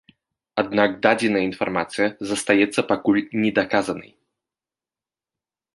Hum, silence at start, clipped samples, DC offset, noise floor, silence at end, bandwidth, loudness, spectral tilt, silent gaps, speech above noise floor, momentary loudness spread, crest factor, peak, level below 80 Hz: none; 0.55 s; under 0.1%; under 0.1%; under -90 dBFS; 1.7 s; 11.5 kHz; -21 LUFS; -4.5 dB/octave; none; over 69 dB; 8 LU; 20 dB; -2 dBFS; -60 dBFS